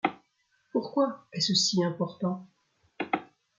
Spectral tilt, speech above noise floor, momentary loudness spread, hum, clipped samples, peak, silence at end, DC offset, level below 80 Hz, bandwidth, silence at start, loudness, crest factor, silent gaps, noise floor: -4 dB/octave; 43 dB; 10 LU; none; under 0.1%; -10 dBFS; 0.35 s; under 0.1%; -74 dBFS; 9.6 kHz; 0.05 s; -29 LUFS; 22 dB; none; -72 dBFS